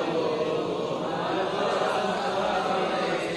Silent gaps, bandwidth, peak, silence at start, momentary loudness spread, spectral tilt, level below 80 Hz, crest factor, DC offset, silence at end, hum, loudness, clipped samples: none; 12 kHz; -14 dBFS; 0 s; 3 LU; -5 dB/octave; -62 dBFS; 14 dB; under 0.1%; 0 s; none; -27 LUFS; under 0.1%